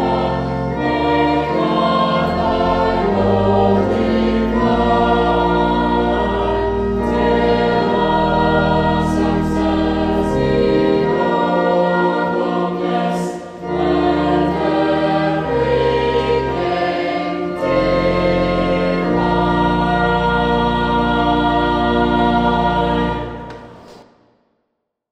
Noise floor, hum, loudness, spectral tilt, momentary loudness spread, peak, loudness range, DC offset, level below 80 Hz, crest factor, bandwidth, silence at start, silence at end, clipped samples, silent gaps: -73 dBFS; none; -16 LUFS; -7.5 dB/octave; 4 LU; -2 dBFS; 2 LU; under 0.1%; -30 dBFS; 14 dB; 10 kHz; 0 s; 1.1 s; under 0.1%; none